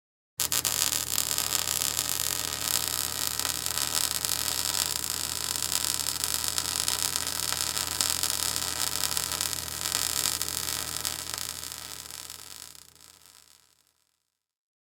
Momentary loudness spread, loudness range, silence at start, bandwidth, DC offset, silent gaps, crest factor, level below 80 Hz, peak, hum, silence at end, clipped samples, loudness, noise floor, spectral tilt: 9 LU; 8 LU; 0.4 s; over 20 kHz; under 0.1%; none; 30 dB; -58 dBFS; 0 dBFS; none; 1.5 s; under 0.1%; -27 LUFS; -78 dBFS; 0 dB/octave